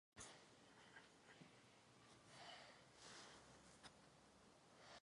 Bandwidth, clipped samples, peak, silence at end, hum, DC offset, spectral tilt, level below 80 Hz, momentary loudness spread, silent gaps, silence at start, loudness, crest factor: 11 kHz; under 0.1%; -44 dBFS; 0 s; none; under 0.1%; -2.5 dB/octave; -86 dBFS; 9 LU; none; 0.15 s; -64 LUFS; 22 dB